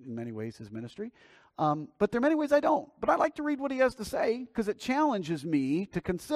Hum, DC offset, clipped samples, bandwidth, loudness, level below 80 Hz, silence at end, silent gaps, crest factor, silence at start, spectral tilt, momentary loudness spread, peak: none; under 0.1%; under 0.1%; 15 kHz; -30 LUFS; -60 dBFS; 0 s; none; 18 dB; 0 s; -6.5 dB/octave; 14 LU; -12 dBFS